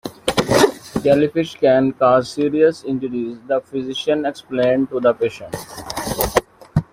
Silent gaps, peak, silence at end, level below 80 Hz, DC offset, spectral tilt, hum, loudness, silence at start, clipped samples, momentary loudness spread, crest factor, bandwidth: none; 0 dBFS; 0.1 s; -44 dBFS; under 0.1%; -5 dB/octave; none; -18 LUFS; 0.05 s; under 0.1%; 10 LU; 18 dB; 16 kHz